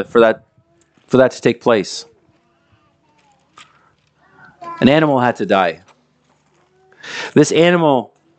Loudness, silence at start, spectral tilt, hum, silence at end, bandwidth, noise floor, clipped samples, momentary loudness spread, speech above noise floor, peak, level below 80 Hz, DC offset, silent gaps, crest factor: -15 LUFS; 0 s; -5.5 dB/octave; none; 0.35 s; 9 kHz; -58 dBFS; under 0.1%; 17 LU; 45 dB; 0 dBFS; -56 dBFS; under 0.1%; none; 18 dB